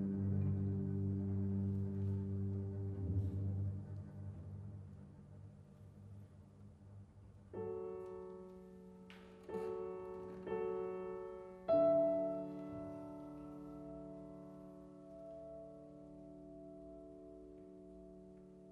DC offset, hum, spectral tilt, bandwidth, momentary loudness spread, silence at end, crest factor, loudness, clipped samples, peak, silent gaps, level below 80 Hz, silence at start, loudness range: under 0.1%; none; -10.5 dB/octave; 4.3 kHz; 20 LU; 0 s; 18 dB; -42 LUFS; under 0.1%; -24 dBFS; none; -66 dBFS; 0 s; 16 LU